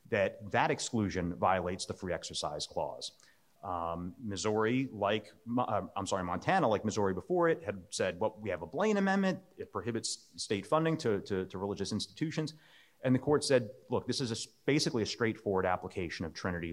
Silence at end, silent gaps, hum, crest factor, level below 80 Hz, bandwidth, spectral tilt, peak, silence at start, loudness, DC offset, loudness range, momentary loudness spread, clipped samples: 0 s; none; none; 20 dB; -68 dBFS; 15 kHz; -5 dB/octave; -14 dBFS; 0.1 s; -34 LUFS; under 0.1%; 4 LU; 9 LU; under 0.1%